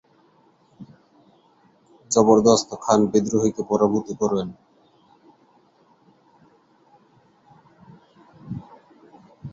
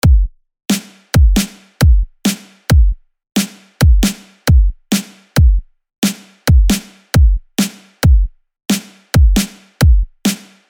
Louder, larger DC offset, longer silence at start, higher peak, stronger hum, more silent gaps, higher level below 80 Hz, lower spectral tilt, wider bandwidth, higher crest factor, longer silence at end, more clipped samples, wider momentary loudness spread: second, -20 LUFS vs -15 LUFS; neither; first, 0.8 s vs 0.05 s; about the same, -2 dBFS vs 0 dBFS; neither; second, none vs 5.98-6.02 s; second, -60 dBFS vs -14 dBFS; about the same, -5.5 dB/octave vs -5 dB/octave; second, 8 kHz vs 19 kHz; first, 24 dB vs 12 dB; second, 0.05 s vs 0.35 s; neither; first, 21 LU vs 9 LU